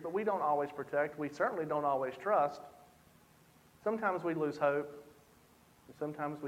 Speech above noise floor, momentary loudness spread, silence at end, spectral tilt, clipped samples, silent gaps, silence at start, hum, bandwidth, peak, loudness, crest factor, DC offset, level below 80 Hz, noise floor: 30 dB; 11 LU; 0 s; -7 dB/octave; under 0.1%; none; 0 s; none; 16 kHz; -18 dBFS; -35 LUFS; 18 dB; under 0.1%; -76 dBFS; -64 dBFS